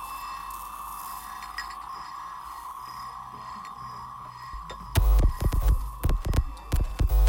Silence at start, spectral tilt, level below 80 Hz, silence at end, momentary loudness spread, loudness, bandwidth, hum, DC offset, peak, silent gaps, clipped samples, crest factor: 0 s; -5.5 dB/octave; -28 dBFS; 0 s; 14 LU; -32 LUFS; 17 kHz; none; under 0.1%; -10 dBFS; none; under 0.1%; 18 dB